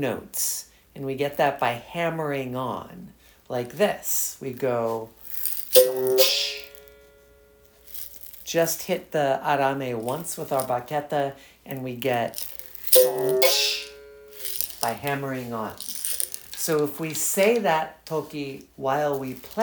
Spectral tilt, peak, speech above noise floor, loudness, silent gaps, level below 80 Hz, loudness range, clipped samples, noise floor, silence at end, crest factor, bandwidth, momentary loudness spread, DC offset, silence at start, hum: -3 dB/octave; 0 dBFS; 31 dB; -24 LUFS; none; -62 dBFS; 6 LU; under 0.1%; -55 dBFS; 0 s; 24 dB; over 20 kHz; 16 LU; under 0.1%; 0 s; none